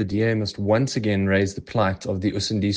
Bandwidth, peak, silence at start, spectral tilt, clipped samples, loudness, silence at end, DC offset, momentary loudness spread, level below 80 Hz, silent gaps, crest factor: 9.6 kHz; -8 dBFS; 0 s; -6 dB/octave; under 0.1%; -23 LUFS; 0 s; under 0.1%; 4 LU; -54 dBFS; none; 14 dB